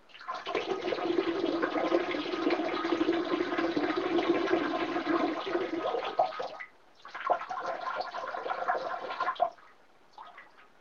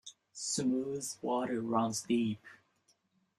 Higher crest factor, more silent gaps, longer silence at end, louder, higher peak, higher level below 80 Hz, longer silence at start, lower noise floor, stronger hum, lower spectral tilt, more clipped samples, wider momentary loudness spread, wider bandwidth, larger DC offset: about the same, 20 dB vs 18 dB; neither; second, 0.15 s vs 0.85 s; about the same, -32 LUFS vs -34 LUFS; first, -12 dBFS vs -18 dBFS; first, -70 dBFS vs -76 dBFS; about the same, 0.1 s vs 0.05 s; second, -61 dBFS vs -74 dBFS; neither; about the same, -5 dB/octave vs -4 dB/octave; neither; about the same, 10 LU vs 8 LU; second, 7 kHz vs 14 kHz; neither